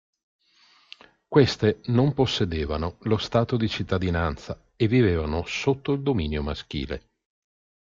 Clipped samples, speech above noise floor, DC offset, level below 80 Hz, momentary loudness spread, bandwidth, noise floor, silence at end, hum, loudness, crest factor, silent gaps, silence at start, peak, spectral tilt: under 0.1%; 36 dB; under 0.1%; -42 dBFS; 11 LU; 7.6 kHz; -60 dBFS; 0.85 s; none; -25 LUFS; 20 dB; none; 1.3 s; -4 dBFS; -6.5 dB/octave